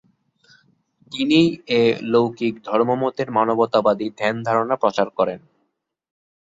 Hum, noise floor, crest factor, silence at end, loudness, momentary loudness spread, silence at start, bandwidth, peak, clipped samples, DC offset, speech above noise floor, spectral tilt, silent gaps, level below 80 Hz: none; -73 dBFS; 18 dB; 1.1 s; -20 LUFS; 6 LU; 1.1 s; 7.8 kHz; -2 dBFS; under 0.1%; under 0.1%; 54 dB; -6.5 dB/octave; none; -62 dBFS